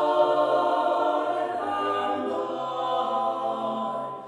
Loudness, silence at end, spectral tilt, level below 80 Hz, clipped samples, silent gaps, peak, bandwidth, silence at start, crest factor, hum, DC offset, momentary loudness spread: -26 LUFS; 0 s; -5 dB/octave; -80 dBFS; under 0.1%; none; -10 dBFS; 11 kHz; 0 s; 16 dB; none; under 0.1%; 7 LU